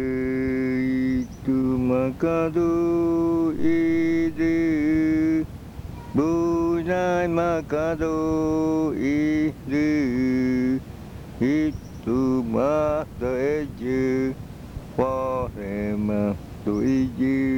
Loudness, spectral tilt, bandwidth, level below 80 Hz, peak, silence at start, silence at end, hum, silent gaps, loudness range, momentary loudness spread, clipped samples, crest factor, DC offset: -23 LUFS; -8 dB/octave; 16.5 kHz; -44 dBFS; -10 dBFS; 0 s; 0 s; none; none; 4 LU; 7 LU; under 0.1%; 14 dB; under 0.1%